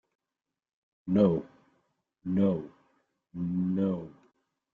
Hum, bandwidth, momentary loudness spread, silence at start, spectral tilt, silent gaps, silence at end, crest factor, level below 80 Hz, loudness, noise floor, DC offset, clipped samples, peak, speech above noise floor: none; 4.4 kHz; 21 LU; 1.05 s; -11 dB/octave; none; 0.6 s; 20 dB; -66 dBFS; -29 LUFS; -89 dBFS; under 0.1%; under 0.1%; -12 dBFS; 62 dB